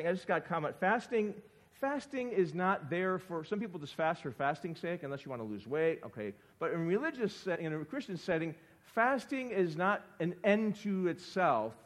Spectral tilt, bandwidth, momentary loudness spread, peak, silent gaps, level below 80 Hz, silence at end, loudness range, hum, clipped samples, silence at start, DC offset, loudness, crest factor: -6.5 dB/octave; 14 kHz; 10 LU; -14 dBFS; none; -76 dBFS; 0.1 s; 3 LU; none; under 0.1%; 0 s; under 0.1%; -35 LUFS; 20 dB